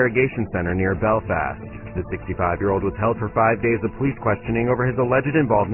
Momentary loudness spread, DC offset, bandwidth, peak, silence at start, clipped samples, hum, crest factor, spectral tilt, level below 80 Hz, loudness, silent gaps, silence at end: 10 LU; under 0.1%; 3.1 kHz; -4 dBFS; 0 s; under 0.1%; none; 16 dB; -12 dB/octave; -40 dBFS; -21 LUFS; none; 0 s